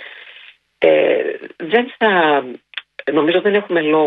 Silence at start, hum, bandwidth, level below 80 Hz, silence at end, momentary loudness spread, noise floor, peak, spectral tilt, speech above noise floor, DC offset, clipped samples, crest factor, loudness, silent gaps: 0 s; none; 4.7 kHz; -66 dBFS; 0 s; 17 LU; -44 dBFS; 0 dBFS; -7.5 dB/octave; 29 dB; under 0.1%; under 0.1%; 16 dB; -16 LUFS; none